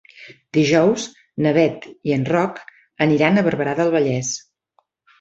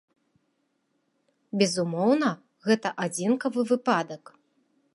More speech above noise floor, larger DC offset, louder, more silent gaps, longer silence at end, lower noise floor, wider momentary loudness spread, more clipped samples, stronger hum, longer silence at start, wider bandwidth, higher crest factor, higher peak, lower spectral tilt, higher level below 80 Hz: about the same, 47 dB vs 49 dB; neither; first, -19 LUFS vs -26 LUFS; neither; about the same, 0.8 s vs 0.8 s; second, -65 dBFS vs -74 dBFS; about the same, 11 LU vs 10 LU; neither; neither; second, 0.2 s vs 1.55 s; second, 8 kHz vs 11.5 kHz; about the same, 18 dB vs 22 dB; first, -2 dBFS vs -6 dBFS; about the same, -5.5 dB/octave vs -5 dB/octave; first, -58 dBFS vs -78 dBFS